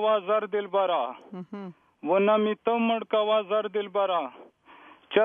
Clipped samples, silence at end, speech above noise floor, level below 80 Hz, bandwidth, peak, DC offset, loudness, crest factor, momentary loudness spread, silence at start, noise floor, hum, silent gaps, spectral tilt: under 0.1%; 0 s; 27 dB; -82 dBFS; 3.7 kHz; -6 dBFS; under 0.1%; -26 LUFS; 20 dB; 16 LU; 0 s; -53 dBFS; none; none; -8 dB/octave